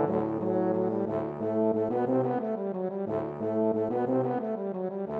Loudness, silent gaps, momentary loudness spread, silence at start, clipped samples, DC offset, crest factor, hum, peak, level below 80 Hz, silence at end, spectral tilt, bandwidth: -29 LUFS; none; 5 LU; 0 s; under 0.1%; under 0.1%; 14 dB; none; -14 dBFS; -66 dBFS; 0 s; -11 dB/octave; 4.8 kHz